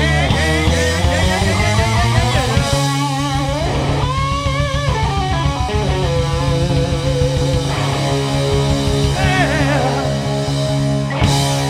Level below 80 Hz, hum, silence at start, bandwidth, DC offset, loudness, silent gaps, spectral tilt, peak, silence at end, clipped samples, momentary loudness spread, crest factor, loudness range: -24 dBFS; none; 0 s; 15 kHz; under 0.1%; -16 LUFS; none; -5 dB/octave; 0 dBFS; 0 s; under 0.1%; 3 LU; 14 dB; 2 LU